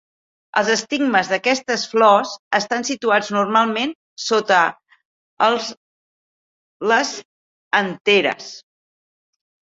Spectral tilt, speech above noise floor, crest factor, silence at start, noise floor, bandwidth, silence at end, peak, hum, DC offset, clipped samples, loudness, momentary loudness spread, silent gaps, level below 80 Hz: -3 dB/octave; over 72 dB; 18 dB; 0.55 s; under -90 dBFS; 7.8 kHz; 1.05 s; -2 dBFS; none; under 0.1%; under 0.1%; -18 LUFS; 10 LU; 2.39-2.51 s, 3.95-4.17 s, 5.05-5.37 s, 5.77-6.80 s, 7.25-7.71 s, 8.01-8.05 s; -68 dBFS